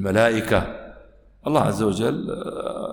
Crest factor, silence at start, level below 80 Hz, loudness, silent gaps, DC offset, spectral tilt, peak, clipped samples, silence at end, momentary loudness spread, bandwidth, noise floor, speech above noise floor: 18 dB; 0 s; -46 dBFS; -22 LUFS; none; under 0.1%; -6 dB/octave; -4 dBFS; under 0.1%; 0 s; 13 LU; 17.5 kHz; -49 dBFS; 27 dB